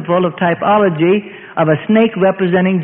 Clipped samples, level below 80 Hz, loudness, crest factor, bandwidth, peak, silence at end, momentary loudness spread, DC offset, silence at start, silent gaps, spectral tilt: under 0.1%; -54 dBFS; -13 LUFS; 12 dB; 3.8 kHz; 0 dBFS; 0 s; 5 LU; under 0.1%; 0 s; none; -12 dB/octave